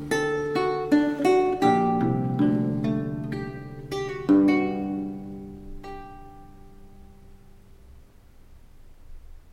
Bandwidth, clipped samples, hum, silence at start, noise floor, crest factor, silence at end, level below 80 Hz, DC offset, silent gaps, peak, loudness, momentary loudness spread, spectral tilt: 13.5 kHz; under 0.1%; none; 0 s; -50 dBFS; 18 dB; 0 s; -48 dBFS; under 0.1%; none; -8 dBFS; -24 LUFS; 20 LU; -7 dB/octave